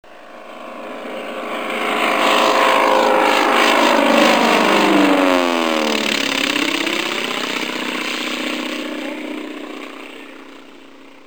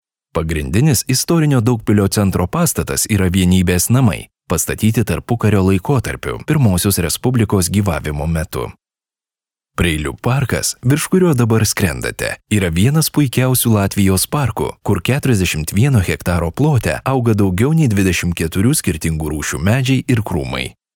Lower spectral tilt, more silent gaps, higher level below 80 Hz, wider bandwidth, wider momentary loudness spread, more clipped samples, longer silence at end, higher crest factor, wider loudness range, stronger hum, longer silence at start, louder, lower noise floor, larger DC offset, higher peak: second, -2.5 dB/octave vs -5.5 dB/octave; neither; second, -62 dBFS vs -36 dBFS; about the same, over 20 kHz vs over 20 kHz; first, 18 LU vs 7 LU; neither; first, 0.5 s vs 0.25 s; first, 18 dB vs 12 dB; first, 10 LU vs 3 LU; neither; second, 0.1 s vs 0.35 s; about the same, -16 LUFS vs -16 LUFS; second, -42 dBFS vs under -90 dBFS; first, 0.6% vs 0.1%; about the same, 0 dBFS vs -2 dBFS